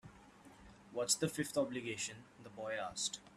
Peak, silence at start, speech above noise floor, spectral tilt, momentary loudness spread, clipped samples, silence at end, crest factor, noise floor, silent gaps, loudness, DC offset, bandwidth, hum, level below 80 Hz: -20 dBFS; 0.05 s; 21 dB; -2.5 dB/octave; 23 LU; under 0.1%; 0 s; 22 dB; -61 dBFS; none; -39 LUFS; under 0.1%; 15 kHz; none; -72 dBFS